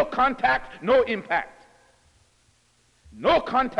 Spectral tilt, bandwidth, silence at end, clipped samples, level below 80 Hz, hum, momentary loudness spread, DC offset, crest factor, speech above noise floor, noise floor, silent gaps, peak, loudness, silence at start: -5.5 dB/octave; 10 kHz; 0 s; under 0.1%; -50 dBFS; 60 Hz at -65 dBFS; 7 LU; under 0.1%; 16 dB; 41 dB; -63 dBFS; none; -10 dBFS; -23 LUFS; 0 s